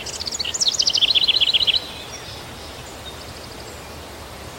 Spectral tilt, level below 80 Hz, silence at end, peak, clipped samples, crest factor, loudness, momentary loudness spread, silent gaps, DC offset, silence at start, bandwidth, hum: 0 dB/octave; -46 dBFS; 0 s; -6 dBFS; under 0.1%; 18 dB; -16 LUFS; 21 LU; none; under 0.1%; 0 s; 16.5 kHz; none